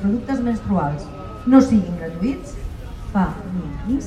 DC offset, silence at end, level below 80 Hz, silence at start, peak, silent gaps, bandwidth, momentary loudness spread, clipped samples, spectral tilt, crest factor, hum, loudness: under 0.1%; 0 s; -34 dBFS; 0 s; 0 dBFS; none; 9.8 kHz; 19 LU; under 0.1%; -8 dB/octave; 20 dB; none; -20 LUFS